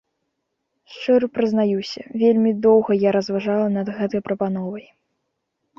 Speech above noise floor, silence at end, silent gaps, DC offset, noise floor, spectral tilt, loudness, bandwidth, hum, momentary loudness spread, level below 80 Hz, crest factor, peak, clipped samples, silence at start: 56 dB; 1 s; none; under 0.1%; -76 dBFS; -7.5 dB/octave; -20 LUFS; 7 kHz; none; 12 LU; -62 dBFS; 16 dB; -4 dBFS; under 0.1%; 0.9 s